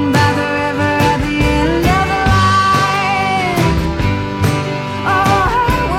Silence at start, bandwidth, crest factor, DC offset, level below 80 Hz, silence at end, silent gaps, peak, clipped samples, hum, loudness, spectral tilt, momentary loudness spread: 0 s; 16.5 kHz; 14 dB; under 0.1%; -26 dBFS; 0 s; none; 0 dBFS; under 0.1%; none; -14 LUFS; -5.5 dB/octave; 5 LU